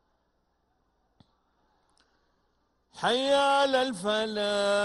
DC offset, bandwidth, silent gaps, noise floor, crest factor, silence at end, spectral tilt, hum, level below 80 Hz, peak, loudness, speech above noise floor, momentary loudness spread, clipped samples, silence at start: under 0.1%; 11.5 kHz; none; -74 dBFS; 18 dB; 0 s; -3 dB/octave; none; -70 dBFS; -12 dBFS; -26 LUFS; 48 dB; 5 LU; under 0.1%; 2.95 s